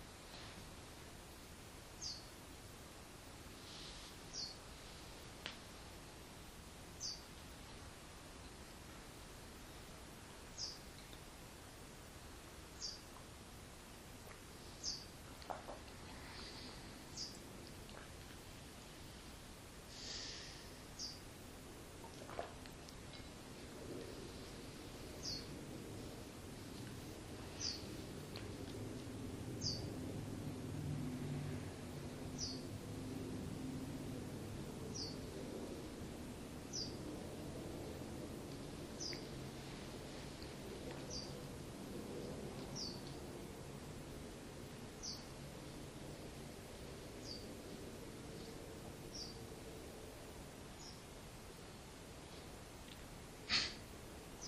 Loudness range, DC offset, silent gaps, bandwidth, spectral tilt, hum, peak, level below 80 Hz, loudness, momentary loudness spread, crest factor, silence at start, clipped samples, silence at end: 6 LU; under 0.1%; none; 15.5 kHz; -4 dB/octave; none; -24 dBFS; -62 dBFS; -50 LUFS; 10 LU; 26 dB; 0 s; under 0.1%; 0 s